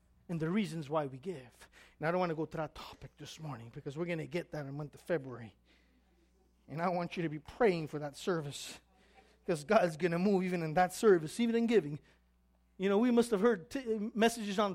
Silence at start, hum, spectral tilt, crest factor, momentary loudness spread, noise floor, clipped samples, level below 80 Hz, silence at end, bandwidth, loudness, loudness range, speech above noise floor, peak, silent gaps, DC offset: 0.3 s; 60 Hz at -65 dBFS; -6 dB/octave; 20 dB; 17 LU; -71 dBFS; under 0.1%; -66 dBFS; 0 s; 15.5 kHz; -34 LUFS; 10 LU; 37 dB; -14 dBFS; none; under 0.1%